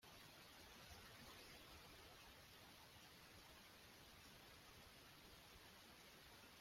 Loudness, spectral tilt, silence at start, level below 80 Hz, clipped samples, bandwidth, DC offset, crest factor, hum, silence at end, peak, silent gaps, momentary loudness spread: -63 LUFS; -2.5 dB/octave; 0 s; -76 dBFS; under 0.1%; 16 kHz; under 0.1%; 18 dB; none; 0 s; -46 dBFS; none; 3 LU